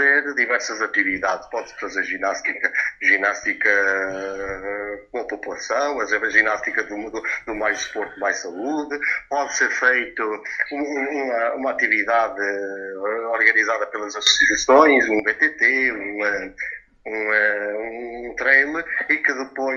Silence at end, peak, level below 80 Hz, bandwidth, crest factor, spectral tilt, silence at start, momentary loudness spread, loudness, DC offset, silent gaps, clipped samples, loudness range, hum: 0 s; 0 dBFS; -56 dBFS; 7.8 kHz; 22 dB; -1 dB/octave; 0 s; 13 LU; -20 LUFS; under 0.1%; none; under 0.1%; 5 LU; none